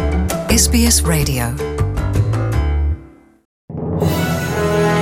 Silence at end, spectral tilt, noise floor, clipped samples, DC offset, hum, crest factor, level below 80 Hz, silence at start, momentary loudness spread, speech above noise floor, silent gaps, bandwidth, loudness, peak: 0 s; -4.5 dB/octave; -40 dBFS; under 0.1%; under 0.1%; none; 14 dB; -24 dBFS; 0 s; 10 LU; 26 dB; 3.45-3.68 s; 17 kHz; -16 LUFS; -2 dBFS